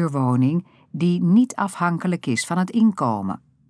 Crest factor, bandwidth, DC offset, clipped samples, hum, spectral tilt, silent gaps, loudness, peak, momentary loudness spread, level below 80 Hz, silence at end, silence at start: 14 dB; 11 kHz; under 0.1%; under 0.1%; none; -6.5 dB/octave; none; -21 LUFS; -8 dBFS; 9 LU; -70 dBFS; 0.35 s; 0 s